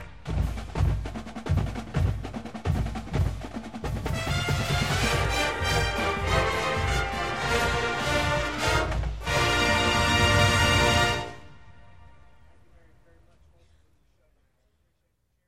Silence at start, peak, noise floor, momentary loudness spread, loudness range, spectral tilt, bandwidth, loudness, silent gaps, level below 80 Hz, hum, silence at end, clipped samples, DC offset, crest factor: 0 s; -8 dBFS; -73 dBFS; 12 LU; 7 LU; -4 dB/octave; 16.5 kHz; -25 LUFS; none; -36 dBFS; none; 0 s; under 0.1%; 0.4%; 18 dB